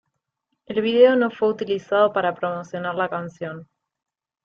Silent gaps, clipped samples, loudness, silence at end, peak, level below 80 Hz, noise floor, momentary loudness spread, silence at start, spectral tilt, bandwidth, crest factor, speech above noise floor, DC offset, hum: none; under 0.1%; -21 LUFS; 0.8 s; -4 dBFS; -68 dBFS; -78 dBFS; 16 LU; 0.7 s; -6.5 dB/octave; 6.8 kHz; 20 dB; 57 dB; under 0.1%; none